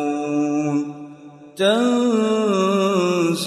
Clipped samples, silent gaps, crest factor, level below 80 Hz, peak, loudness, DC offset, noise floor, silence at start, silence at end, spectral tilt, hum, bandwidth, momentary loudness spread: under 0.1%; none; 14 dB; -70 dBFS; -6 dBFS; -19 LUFS; under 0.1%; -41 dBFS; 0 s; 0 s; -5.5 dB/octave; none; 13 kHz; 14 LU